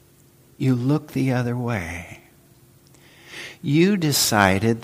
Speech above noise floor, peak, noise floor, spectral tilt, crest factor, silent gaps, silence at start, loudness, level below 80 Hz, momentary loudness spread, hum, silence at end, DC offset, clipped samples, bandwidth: 33 dB; 0 dBFS; -54 dBFS; -5 dB/octave; 22 dB; none; 0.6 s; -21 LUFS; -54 dBFS; 19 LU; none; 0 s; under 0.1%; under 0.1%; 15.5 kHz